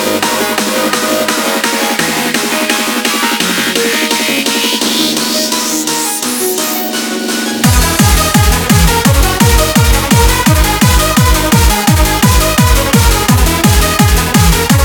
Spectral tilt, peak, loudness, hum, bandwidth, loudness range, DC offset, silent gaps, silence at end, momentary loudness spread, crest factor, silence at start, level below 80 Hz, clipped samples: -3.5 dB/octave; 0 dBFS; -10 LUFS; none; over 20 kHz; 3 LU; 0.3%; none; 0 s; 4 LU; 10 dB; 0 s; -16 dBFS; 0.1%